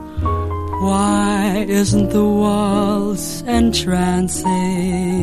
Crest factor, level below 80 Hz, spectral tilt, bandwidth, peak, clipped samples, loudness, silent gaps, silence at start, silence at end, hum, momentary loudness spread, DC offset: 14 dB; -32 dBFS; -5.5 dB/octave; 13.5 kHz; -2 dBFS; under 0.1%; -17 LUFS; none; 0 s; 0 s; none; 6 LU; under 0.1%